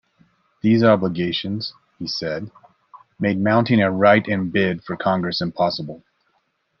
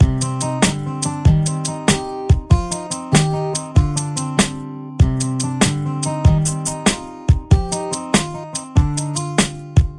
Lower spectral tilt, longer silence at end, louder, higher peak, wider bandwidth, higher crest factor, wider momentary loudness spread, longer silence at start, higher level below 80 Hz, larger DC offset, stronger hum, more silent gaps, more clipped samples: first, -7.5 dB/octave vs -5 dB/octave; first, 0.8 s vs 0 s; about the same, -20 LUFS vs -18 LUFS; about the same, -2 dBFS vs 0 dBFS; second, 6.6 kHz vs 11.5 kHz; about the same, 20 dB vs 16 dB; first, 14 LU vs 7 LU; first, 0.65 s vs 0 s; second, -62 dBFS vs -26 dBFS; neither; neither; neither; neither